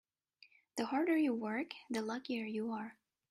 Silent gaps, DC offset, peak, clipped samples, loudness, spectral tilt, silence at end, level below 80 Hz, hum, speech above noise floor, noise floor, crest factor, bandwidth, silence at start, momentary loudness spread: none; under 0.1%; -22 dBFS; under 0.1%; -38 LUFS; -5 dB/octave; 0.4 s; -84 dBFS; none; 31 dB; -68 dBFS; 16 dB; 15 kHz; 0.75 s; 11 LU